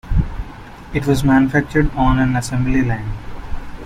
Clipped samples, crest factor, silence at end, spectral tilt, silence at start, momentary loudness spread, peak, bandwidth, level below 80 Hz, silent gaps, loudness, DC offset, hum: under 0.1%; 16 dB; 0 s; -7 dB/octave; 0.05 s; 19 LU; -2 dBFS; 14.5 kHz; -26 dBFS; none; -17 LUFS; under 0.1%; none